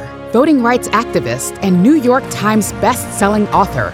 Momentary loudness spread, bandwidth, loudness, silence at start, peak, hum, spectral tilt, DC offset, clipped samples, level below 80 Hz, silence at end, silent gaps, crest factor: 7 LU; 17 kHz; -13 LUFS; 0 s; 0 dBFS; none; -5.5 dB/octave; under 0.1%; under 0.1%; -38 dBFS; 0 s; none; 12 dB